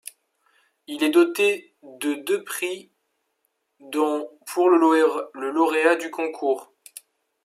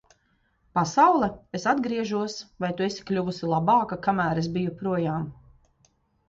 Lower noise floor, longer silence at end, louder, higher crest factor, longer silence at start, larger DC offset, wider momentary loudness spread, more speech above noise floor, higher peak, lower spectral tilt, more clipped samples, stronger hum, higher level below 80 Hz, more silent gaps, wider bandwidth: first, -74 dBFS vs -68 dBFS; second, 0.8 s vs 0.95 s; first, -22 LUFS vs -25 LUFS; about the same, 20 dB vs 20 dB; first, 0.9 s vs 0.75 s; neither; first, 17 LU vs 11 LU; first, 53 dB vs 43 dB; about the same, -4 dBFS vs -6 dBFS; second, -2.5 dB/octave vs -6 dB/octave; neither; neither; second, -84 dBFS vs -58 dBFS; neither; first, 15.5 kHz vs 7.8 kHz